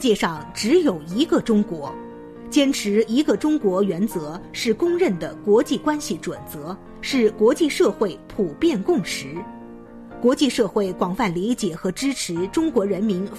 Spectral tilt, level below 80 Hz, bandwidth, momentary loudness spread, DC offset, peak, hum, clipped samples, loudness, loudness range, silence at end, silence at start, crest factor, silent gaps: -5 dB/octave; -50 dBFS; 14 kHz; 14 LU; under 0.1%; -6 dBFS; none; under 0.1%; -21 LUFS; 2 LU; 0 s; 0 s; 14 dB; none